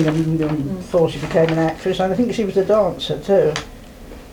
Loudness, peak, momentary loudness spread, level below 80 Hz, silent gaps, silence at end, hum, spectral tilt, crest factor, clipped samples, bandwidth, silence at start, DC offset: -19 LUFS; -4 dBFS; 9 LU; -42 dBFS; none; 0 s; none; -6.5 dB/octave; 14 dB; under 0.1%; 19.5 kHz; 0 s; under 0.1%